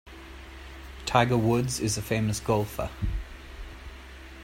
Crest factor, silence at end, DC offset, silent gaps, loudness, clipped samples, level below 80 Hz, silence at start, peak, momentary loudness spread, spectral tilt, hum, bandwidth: 24 dB; 0 s; under 0.1%; none; -27 LUFS; under 0.1%; -40 dBFS; 0.05 s; -6 dBFS; 21 LU; -5 dB/octave; none; 16.5 kHz